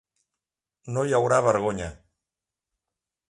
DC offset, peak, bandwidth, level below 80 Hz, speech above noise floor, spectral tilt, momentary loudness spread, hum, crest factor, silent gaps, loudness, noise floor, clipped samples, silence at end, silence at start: under 0.1%; -6 dBFS; 11.5 kHz; -54 dBFS; 65 dB; -5.5 dB/octave; 13 LU; none; 22 dB; none; -24 LUFS; -88 dBFS; under 0.1%; 1.35 s; 0.85 s